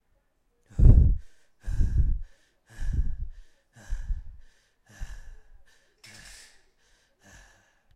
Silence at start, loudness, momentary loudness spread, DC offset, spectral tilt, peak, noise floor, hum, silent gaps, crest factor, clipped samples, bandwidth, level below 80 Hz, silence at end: 0.75 s; -27 LUFS; 27 LU; under 0.1%; -8 dB/octave; -4 dBFS; -69 dBFS; none; none; 22 dB; under 0.1%; 8.8 kHz; -28 dBFS; 2.6 s